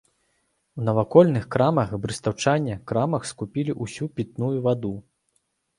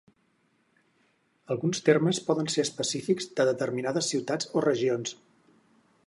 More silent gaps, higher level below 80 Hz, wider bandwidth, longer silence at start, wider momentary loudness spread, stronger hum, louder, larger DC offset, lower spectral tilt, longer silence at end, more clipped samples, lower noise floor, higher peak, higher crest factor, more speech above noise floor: neither; first, -54 dBFS vs -76 dBFS; about the same, 11.5 kHz vs 11.5 kHz; second, 0.75 s vs 1.5 s; first, 13 LU vs 7 LU; neither; first, -24 LUFS vs -27 LUFS; neither; first, -6.5 dB/octave vs -4.5 dB/octave; second, 0.8 s vs 0.95 s; neither; about the same, -71 dBFS vs -70 dBFS; first, -2 dBFS vs -8 dBFS; about the same, 22 dB vs 20 dB; first, 49 dB vs 43 dB